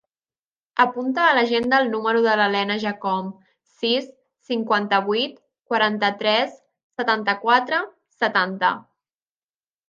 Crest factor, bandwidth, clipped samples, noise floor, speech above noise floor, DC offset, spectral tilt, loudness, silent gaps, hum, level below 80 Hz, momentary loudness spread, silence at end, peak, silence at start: 20 dB; 7.4 kHz; under 0.1%; under -90 dBFS; over 69 dB; under 0.1%; -5 dB/octave; -21 LUFS; 6.83-6.90 s; none; -70 dBFS; 9 LU; 1.05 s; -2 dBFS; 0.75 s